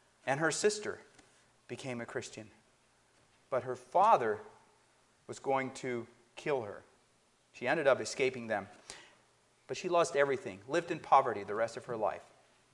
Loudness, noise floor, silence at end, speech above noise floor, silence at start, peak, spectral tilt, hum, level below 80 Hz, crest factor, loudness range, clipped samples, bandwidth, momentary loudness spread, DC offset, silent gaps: -34 LUFS; -70 dBFS; 0.5 s; 37 dB; 0.25 s; -12 dBFS; -4 dB/octave; none; -78 dBFS; 24 dB; 7 LU; under 0.1%; 11.5 kHz; 20 LU; under 0.1%; none